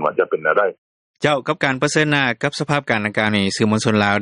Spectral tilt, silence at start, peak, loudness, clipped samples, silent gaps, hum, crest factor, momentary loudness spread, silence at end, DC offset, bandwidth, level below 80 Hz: -5 dB/octave; 0 s; 0 dBFS; -18 LUFS; under 0.1%; 0.78-1.14 s; none; 18 dB; 4 LU; 0 s; under 0.1%; 11 kHz; -58 dBFS